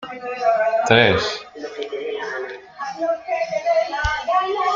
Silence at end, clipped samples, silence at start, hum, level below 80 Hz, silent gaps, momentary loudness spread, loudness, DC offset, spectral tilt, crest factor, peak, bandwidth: 0 s; under 0.1%; 0 s; none; -42 dBFS; none; 16 LU; -20 LUFS; under 0.1%; -4.5 dB/octave; 20 dB; 0 dBFS; 7.6 kHz